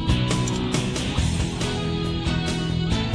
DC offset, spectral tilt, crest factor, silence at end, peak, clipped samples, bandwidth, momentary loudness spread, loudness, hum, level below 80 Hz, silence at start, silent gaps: under 0.1%; -5 dB/octave; 14 dB; 0 s; -10 dBFS; under 0.1%; 11 kHz; 3 LU; -24 LUFS; none; -32 dBFS; 0 s; none